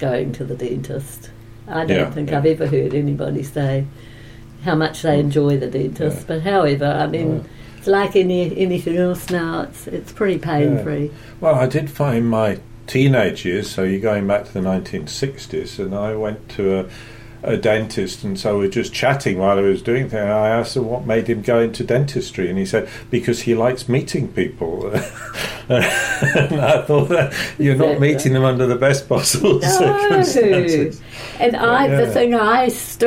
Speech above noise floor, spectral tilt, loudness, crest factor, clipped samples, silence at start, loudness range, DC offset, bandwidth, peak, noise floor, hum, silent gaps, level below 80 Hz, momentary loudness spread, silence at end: 20 dB; -5.5 dB/octave; -18 LUFS; 14 dB; under 0.1%; 0 s; 5 LU; under 0.1%; 16.5 kHz; -4 dBFS; -38 dBFS; none; none; -44 dBFS; 11 LU; 0 s